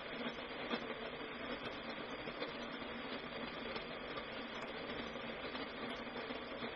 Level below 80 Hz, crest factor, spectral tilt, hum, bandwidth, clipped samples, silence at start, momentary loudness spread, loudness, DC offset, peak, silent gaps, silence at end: -66 dBFS; 20 dB; -1.5 dB/octave; none; 6.4 kHz; under 0.1%; 0 s; 3 LU; -45 LUFS; under 0.1%; -26 dBFS; none; 0 s